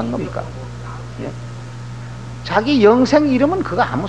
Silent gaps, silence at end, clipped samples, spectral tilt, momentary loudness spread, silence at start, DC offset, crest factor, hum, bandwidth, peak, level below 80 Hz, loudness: none; 0 s; under 0.1%; -6.5 dB/octave; 19 LU; 0 s; 0.7%; 18 dB; 60 Hz at -30 dBFS; 9.6 kHz; 0 dBFS; -40 dBFS; -15 LUFS